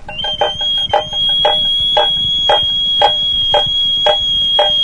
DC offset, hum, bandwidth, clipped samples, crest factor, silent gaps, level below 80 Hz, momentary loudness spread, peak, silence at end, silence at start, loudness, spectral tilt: under 0.1%; none; 10.5 kHz; under 0.1%; 14 dB; none; -36 dBFS; 4 LU; 0 dBFS; 0 s; 0 s; -11 LUFS; -2.5 dB/octave